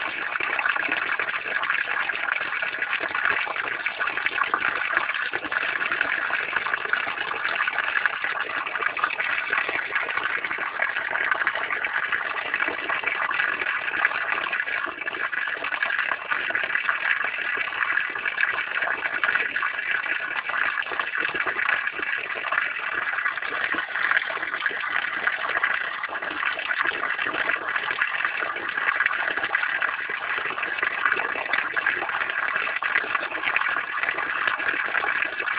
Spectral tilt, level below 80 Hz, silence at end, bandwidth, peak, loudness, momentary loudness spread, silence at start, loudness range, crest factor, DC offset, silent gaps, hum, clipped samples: -6 dB/octave; -68 dBFS; 0 s; 5.2 kHz; -4 dBFS; -24 LUFS; 3 LU; 0 s; 1 LU; 22 dB; under 0.1%; none; none; under 0.1%